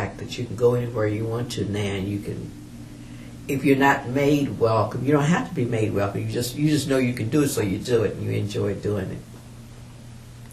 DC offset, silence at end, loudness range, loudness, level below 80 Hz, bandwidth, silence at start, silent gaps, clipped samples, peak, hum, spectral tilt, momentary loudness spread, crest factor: under 0.1%; 0 s; 5 LU; -23 LUFS; -48 dBFS; 14 kHz; 0 s; none; under 0.1%; -4 dBFS; none; -6 dB/octave; 20 LU; 20 dB